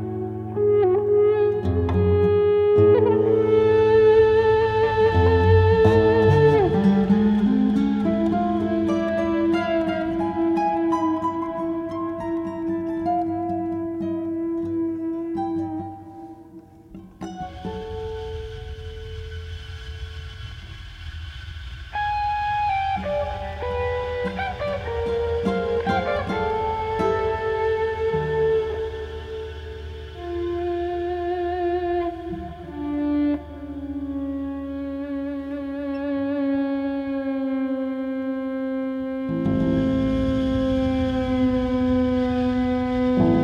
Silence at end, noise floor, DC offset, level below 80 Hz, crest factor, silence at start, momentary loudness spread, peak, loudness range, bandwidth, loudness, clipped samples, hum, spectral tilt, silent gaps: 0 s; -45 dBFS; under 0.1%; -40 dBFS; 18 dB; 0 s; 18 LU; -4 dBFS; 14 LU; 7.2 kHz; -22 LUFS; under 0.1%; none; -8.5 dB/octave; none